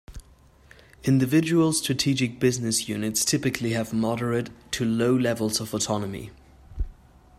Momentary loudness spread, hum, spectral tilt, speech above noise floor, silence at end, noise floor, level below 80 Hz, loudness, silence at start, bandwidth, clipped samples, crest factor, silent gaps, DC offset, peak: 14 LU; none; -4.5 dB/octave; 30 dB; 0.45 s; -54 dBFS; -44 dBFS; -24 LUFS; 0.1 s; 16 kHz; under 0.1%; 18 dB; none; under 0.1%; -8 dBFS